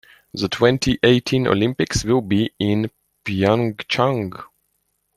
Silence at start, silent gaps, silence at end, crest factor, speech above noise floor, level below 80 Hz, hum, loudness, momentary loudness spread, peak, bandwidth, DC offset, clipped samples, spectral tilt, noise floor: 0.35 s; none; 0.7 s; 18 dB; 51 dB; -44 dBFS; none; -19 LUFS; 12 LU; -2 dBFS; 13.5 kHz; under 0.1%; under 0.1%; -5.5 dB/octave; -70 dBFS